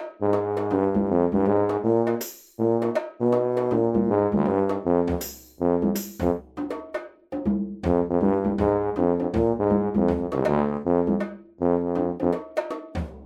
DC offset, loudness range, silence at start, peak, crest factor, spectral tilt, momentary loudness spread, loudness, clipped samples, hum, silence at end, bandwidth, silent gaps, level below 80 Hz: under 0.1%; 3 LU; 0 s; -8 dBFS; 16 dB; -7.5 dB/octave; 9 LU; -24 LUFS; under 0.1%; none; 0 s; 17 kHz; none; -44 dBFS